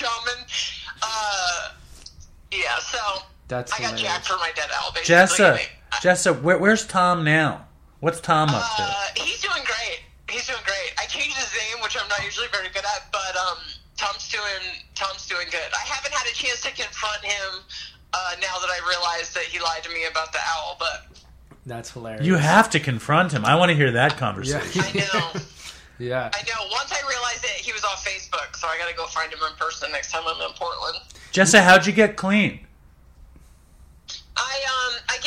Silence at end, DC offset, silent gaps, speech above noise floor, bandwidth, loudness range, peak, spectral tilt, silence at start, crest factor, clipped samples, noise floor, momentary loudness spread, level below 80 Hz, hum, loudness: 0 s; under 0.1%; none; 29 dB; 16 kHz; 8 LU; -2 dBFS; -3.5 dB/octave; 0 s; 22 dB; under 0.1%; -51 dBFS; 12 LU; -50 dBFS; none; -22 LUFS